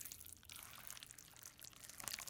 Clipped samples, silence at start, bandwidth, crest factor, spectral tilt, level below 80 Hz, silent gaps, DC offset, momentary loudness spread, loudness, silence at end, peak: under 0.1%; 0 s; 18 kHz; 36 dB; 0 dB/octave; -76 dBFS; none; under 0.1%; 6 LU; -53 LUFS; 0 s; -18 dBFS